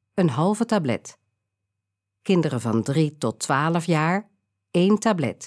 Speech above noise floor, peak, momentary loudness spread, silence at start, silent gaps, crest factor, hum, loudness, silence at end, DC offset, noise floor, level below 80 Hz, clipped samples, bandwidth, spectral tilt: 61 dB; -8 dBFS; 7 LU; 0.15 s; none; 16 dB; none; -23 LUFS; 0 s; under 0.1%; -82 dBFS; -70 dBFS; under 0.1%; 11 kHz; -6 dB/octave